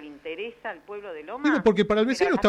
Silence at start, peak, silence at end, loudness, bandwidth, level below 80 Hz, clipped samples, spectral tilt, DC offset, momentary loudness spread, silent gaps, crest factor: 0 s; -8 dBFS; 0 s; -24 LUFS; 11.5 kHz; -54 dBFS; under 0.1%; -5.5 dB/octave; under 0.1%; 16 LU; none; 18 dB